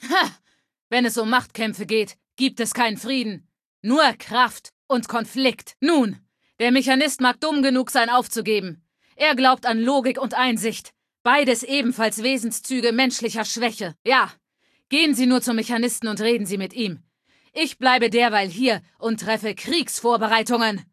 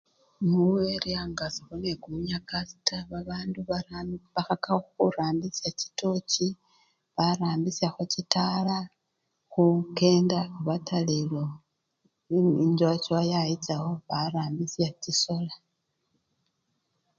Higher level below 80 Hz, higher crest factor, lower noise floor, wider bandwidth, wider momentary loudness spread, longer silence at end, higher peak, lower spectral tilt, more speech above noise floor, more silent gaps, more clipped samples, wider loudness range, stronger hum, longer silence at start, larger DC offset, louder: second, -70 dBFS vs -60 dBFS; second, 20 dB vs 26 dB; second, -68 dBFS vs -79 dBFS; first, 14.5 kHz vs 7.6 kHz; about the same, 9 LU vs 10 LU; second, 0.1 s vs 1.6 s; about the same, -2 dBFS vs -4 dBFS; second, -3 dB/octave vs -5.5 dB/octave; second, 47 dB vs 51 dB; first, 0.81-0.90 s, 3.65-3.83 s, 4.72-4.89 s, 11.20-11.25 s, 13.99-14.05 s vs none; neither; second, 2 LU vs 5 LU; neither; second, 0 s vs 0.4 s; neither; first, -21 LUFS vs -28 LUFS